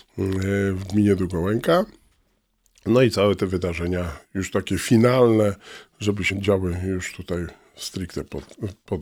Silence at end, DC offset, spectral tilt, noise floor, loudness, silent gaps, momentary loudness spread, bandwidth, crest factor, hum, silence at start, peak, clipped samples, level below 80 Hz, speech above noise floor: 0 s; under 0.1%; -6 dB/octave; -67 dBFS; -22 LUFS; none; 15 LU; 16.5 kHz; 18 dB; none; 0.15 s; -4 dBFS; under 0.1%; -46 dBFS; 45 dB